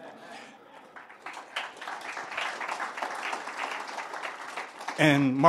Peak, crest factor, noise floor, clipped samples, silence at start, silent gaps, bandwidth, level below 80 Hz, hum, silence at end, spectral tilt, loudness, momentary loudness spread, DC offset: -4 dBFS; 26 dB; -51 dBFS; under 0.1%; 0 s; none; 14 kHz; -74 dBFS; none; 0 s; -5 dB/octave; -31 LUFS; 22 LU; under 0.1%